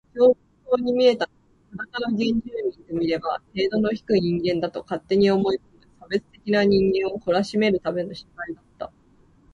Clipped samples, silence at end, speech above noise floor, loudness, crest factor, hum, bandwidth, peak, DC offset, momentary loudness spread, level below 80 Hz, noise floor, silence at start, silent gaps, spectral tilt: under 0.1%; 0.65 s; 35 dB; -23 LUFS; 16 dB; none; 10.5 kHz; -6 dBFS; under 0.1%; 16 LU; -54 dBFS; -57 dBFS; 0.15 s; none; -7 dB/octave